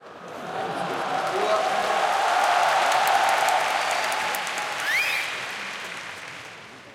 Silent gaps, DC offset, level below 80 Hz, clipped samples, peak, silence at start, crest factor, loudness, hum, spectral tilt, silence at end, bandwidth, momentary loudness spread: none; under 0.1%; -72 dBFS; under 0.1%; -6 dBFS; 0 s; 18 dB; -23 LUFS; none; -1.5 dB/octave; 0 s; 17 kHz; 16 LU